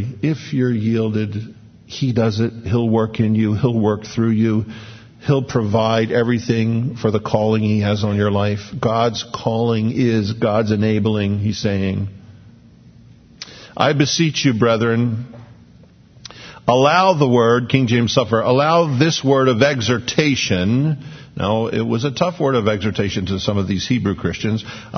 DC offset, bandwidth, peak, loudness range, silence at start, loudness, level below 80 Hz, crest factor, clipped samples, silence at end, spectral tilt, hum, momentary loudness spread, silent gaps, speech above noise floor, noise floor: under 0.1%; 6.6 kHz; 0 dBFS; 5 LU; 0 s; -18 LUFS; -50 dBFS; 18 dB; under 0.1%; 0 s; -6 dB/octave; none; 9 LU; none; 29 dB; -46 dBFS